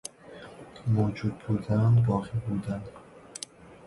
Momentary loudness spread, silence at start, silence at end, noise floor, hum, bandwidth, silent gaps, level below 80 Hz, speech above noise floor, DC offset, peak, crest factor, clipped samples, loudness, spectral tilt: 22 LU; 0.25 s; 0 s; -47 dBFS; none; 11.5 kHz; none; -52 dBFS; 21 dB; under 0.1%; -12 dBFS; 16 dB; under 0.1%; -28 LUFS; -7.5 dB/octave